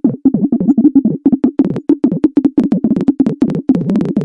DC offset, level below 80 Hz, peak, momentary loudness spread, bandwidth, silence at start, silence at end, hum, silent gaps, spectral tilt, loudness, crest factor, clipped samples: under 0.1%; -48 dBFS; 0 dBFS; 3 LU; 4.9 kHz; 0.05 s; 0 s; none; none; -10.5 dB/octave; -13 LUFS; 12 dB; under 0.1%